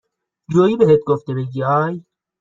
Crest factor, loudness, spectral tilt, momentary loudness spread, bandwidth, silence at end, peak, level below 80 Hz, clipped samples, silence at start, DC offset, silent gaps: 16 dB; -17 LUFS; -8.5 dB/octave; 11 LU; 7.4 kHz; 0.4 s; -2 dBFS; -56 dBFS; under 0.1%; 0.5 s; under 0.1%; none